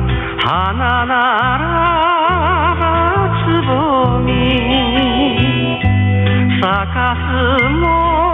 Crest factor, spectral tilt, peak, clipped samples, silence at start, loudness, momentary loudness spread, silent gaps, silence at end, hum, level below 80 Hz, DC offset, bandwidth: 10 dB; -8.5 dB/octave; -2 dBFS; under 0.1%; 0 s; -14 LUFS; 2 LU; none; 0 s; none; -26 dBFS; under 0.1%; 4.1 kHz